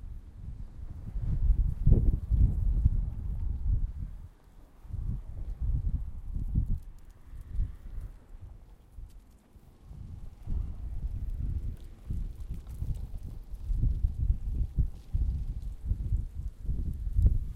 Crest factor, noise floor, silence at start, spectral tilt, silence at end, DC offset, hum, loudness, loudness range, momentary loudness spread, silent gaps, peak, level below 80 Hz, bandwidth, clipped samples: 22 dB; -55 dBFS; 0 s; -10 dB/octave; 0 s; under 0.1%; none; -34 LUFS; 13 LU; 21 LU; none; -8 dBFS; -32 dBFS; 2.2 kHz; under 0.1%